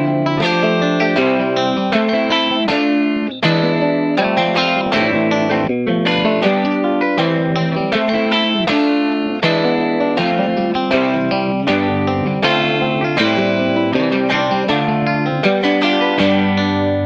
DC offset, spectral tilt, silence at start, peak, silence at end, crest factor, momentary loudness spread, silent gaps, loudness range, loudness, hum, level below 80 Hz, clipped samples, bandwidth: under 0.1%; -6.5 dB/octave; 0 s; -2 dBFS; 0 s; 14 dB; 2 LU; none; 1 LU; -16 LUFS; none; -48 dBFS; under 0.1%; 7.8 kHz